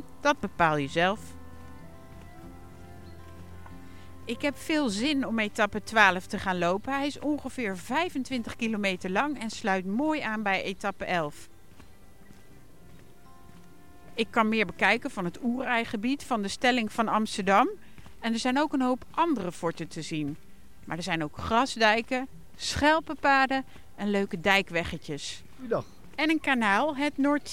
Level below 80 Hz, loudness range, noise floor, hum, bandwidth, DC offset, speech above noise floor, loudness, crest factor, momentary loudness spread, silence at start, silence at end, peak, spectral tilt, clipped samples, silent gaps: -56 dBFS; 8 LU; -54 dBFS; none; 16.5 kHz; 0.6%; 26 dB; -28 LUFS; 24 dB; 22 LU; 0 s; 0 s; -6 dBFS; -4.5 dB/octave; under 0.1%; none